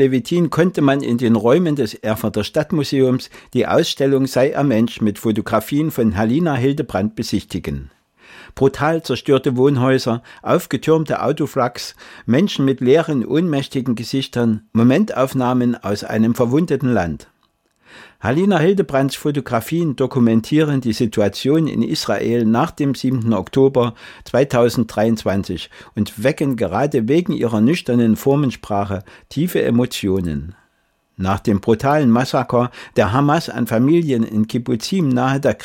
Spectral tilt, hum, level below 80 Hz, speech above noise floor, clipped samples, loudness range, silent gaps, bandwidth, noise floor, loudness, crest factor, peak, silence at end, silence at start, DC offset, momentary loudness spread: -6.5 dB/octave; none; -48 dBFS; 47 dB; under 0.1%; 2 LU; none; 17 kHz; -64 dBFS; -17 LUFS; 14 dB; -4 dBFS; 0 s; 0 s; under 0.1%; 8 LU